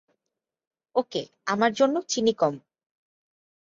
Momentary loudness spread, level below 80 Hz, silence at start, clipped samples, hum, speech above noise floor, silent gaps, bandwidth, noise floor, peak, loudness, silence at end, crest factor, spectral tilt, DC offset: 10 LU; -72 dBFS; 0.95 s; under 0.1%; none; 61 dB; none; 7.8 kHz; -86 dBFS; -6 dBFS; -25 LUFS; 1.1 s; 20 dB; -4 dB/octave; under 0.1%